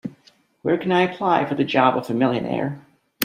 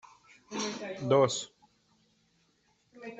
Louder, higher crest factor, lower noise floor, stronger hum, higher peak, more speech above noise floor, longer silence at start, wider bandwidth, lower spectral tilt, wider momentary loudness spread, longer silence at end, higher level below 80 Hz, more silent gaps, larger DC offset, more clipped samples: first, -21 LUFS vs -30 LUFS; about the same, 22 dB vs 22 dB; second, -57 dBFS vs -71 dBFS; neither; first, 0 dBFS vs -12 dBFS; second, 37 dB vs 42 dB; second, 0.05 s vs 0.5 s; first, 15.5 kHz vs 8.2 kHz; first, -6 dB/octave vs -4.5 dB/octave; second, 11 LU vs 19 LU; about the same, 0 s vs 0 s; first, -64 dBFS vs -74 dBFS; neither; neither; neither